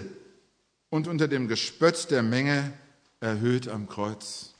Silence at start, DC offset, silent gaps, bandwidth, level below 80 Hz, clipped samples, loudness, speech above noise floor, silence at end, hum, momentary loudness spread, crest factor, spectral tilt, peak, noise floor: 0 s; under 0.1%; none; 10.5 kHz; -72 dBFS; under 0.1%; -27 LUFS; 43 dB; 0.1 s; none; 11 LU; 20 dB; -5 dB/octave; -8 dBFS; -70 dBFS